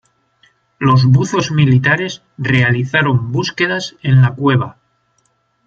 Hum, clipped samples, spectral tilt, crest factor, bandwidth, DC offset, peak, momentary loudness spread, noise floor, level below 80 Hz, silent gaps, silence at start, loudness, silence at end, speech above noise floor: none; under 0.1%; -6.5 dB/octave; 14 dB; 7.4 kHz; under 0.1%; 0 dBFS; 8 LU; -62 dBFS; -50 dBFS; none; 0.8 s; -14 LUFS; 0.95 s; 48 dB